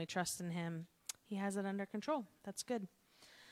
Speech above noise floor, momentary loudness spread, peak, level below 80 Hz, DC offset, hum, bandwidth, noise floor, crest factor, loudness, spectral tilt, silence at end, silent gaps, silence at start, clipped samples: 22 dB; 10 LU; -24 dBFS; -82 dBFS; under 0.1%; none; 16 kHz; -64 dBFS; 18 dB; -43 LUFS; -4.5 dB/octave; 0 s; none; 0 s; under 0.1%